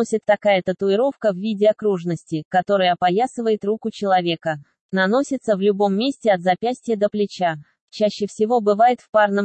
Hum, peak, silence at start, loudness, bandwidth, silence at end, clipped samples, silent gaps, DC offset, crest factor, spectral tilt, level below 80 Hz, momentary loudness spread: none; -6 dBFS; 0 s; -20 LUFS; 9 kHz; 0 s; under 0.1%; 2.45-2.51 s, 4.81-4.89 s, 7.81-7.88 s, 9.09-9.13 s; under 0.1%; 14 dB; -5.5 dB/octave; -68 dBFS; 7 LU